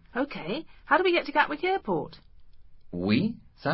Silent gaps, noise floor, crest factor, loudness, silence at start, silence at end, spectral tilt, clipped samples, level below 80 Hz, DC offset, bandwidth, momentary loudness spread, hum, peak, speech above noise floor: none; -47 dBFS; 22 dB; -27 LUFS; 0.15 s; 0 s; -10 dB/octave; under 0.1%; -56 dBFS; under 0.1%; 5.8 kHz; 12 LU; none; -6 dBFS; 20 dB